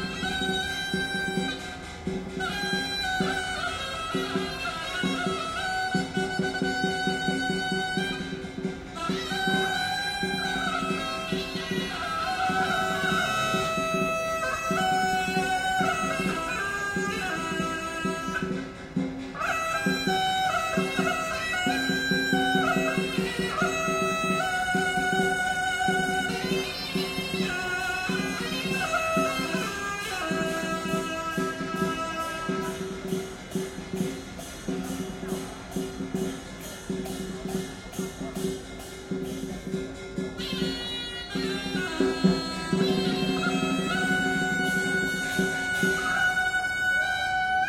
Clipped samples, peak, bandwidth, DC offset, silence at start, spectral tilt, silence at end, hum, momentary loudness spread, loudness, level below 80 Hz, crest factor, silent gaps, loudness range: under 0.1%; -10 dBFS; 16.5 kHz; under 0.1%; 0 s; -4 dB/octave; 0 s; none; 9 LU; -28 LUFS; -50 dBFS; 18 dB; none; 8 LU